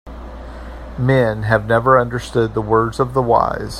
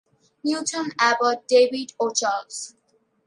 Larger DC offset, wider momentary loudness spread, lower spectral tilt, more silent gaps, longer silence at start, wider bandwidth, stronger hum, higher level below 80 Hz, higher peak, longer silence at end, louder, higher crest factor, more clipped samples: neither; first, 20 LU vs 14 LU; first, -7 dB/octave vs -1.5 dB/octave; neither; second, 0.05 s vs 0.45 s; first, 13.5 kHz vs 11 kHz; neither; first, -34 dBFS vs -78 dBFS; first, 0 dBFS vs -4 dBFS; second, 0 s vs 0.55 s; first, -16 LUFS vs -22 LUFS; about the same, 16 dB vs 18 dB; neither